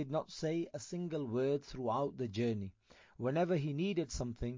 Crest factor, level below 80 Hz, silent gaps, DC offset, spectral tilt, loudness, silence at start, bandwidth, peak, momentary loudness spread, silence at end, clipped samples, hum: 14 dB; -56 dBFS; none; under 0.1%; -6.5 dB/octave; -38 LUFS; 0 s; 7.6 kHz; -22 dBFS; 7 LU; 0 s; under 0.1%; none